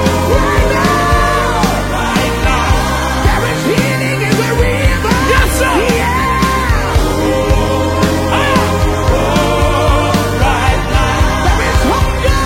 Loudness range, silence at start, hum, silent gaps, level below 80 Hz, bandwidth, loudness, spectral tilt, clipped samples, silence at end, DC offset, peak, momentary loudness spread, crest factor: 1 LU; 0 s; none; none; -18 dBFS; 16.5 kHz; -12 LUFS; -5 dB/octave; under 0.1%; 0 s; under 0.1%; 0 dBFS; 2 LU; 12 dB